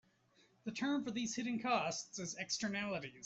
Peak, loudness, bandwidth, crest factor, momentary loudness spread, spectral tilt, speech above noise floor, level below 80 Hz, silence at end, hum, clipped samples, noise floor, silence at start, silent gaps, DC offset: -24 dBFS; -39 LUFS; 8.2 kHz; 18 dB; 8 LU; -3 dB/octave; 32 dB; -78 dBFS; 0 s; none; under 0.1%; -72 dBFS; 0.65 s; none; under 0.1%